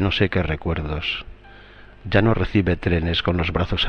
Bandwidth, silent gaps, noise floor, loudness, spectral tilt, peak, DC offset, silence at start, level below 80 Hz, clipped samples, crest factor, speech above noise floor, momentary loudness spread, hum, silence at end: 6.6 kHz; none; -44 dBFS; -22 LUFS; -7.5 dB/octave; -2 dBFS; under 0.1%; 0 s; -34 dBFS; under 0.1%; 18 dB; 23 dB; 7 LU; 50 Hz at -40 dBFS; 0 s